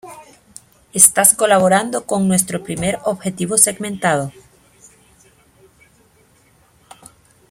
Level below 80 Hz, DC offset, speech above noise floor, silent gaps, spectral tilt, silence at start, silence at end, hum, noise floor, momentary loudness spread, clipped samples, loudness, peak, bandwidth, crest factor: -54 dBFS; under 0.1%; 38 dB; none; -3 dB/octave; 0.05 s; 3.2 s; none; -54 dBFS; 12 LU; under 0.1%; -14 LUFS; 0 dBFS; 16.5 kHz; 20 dB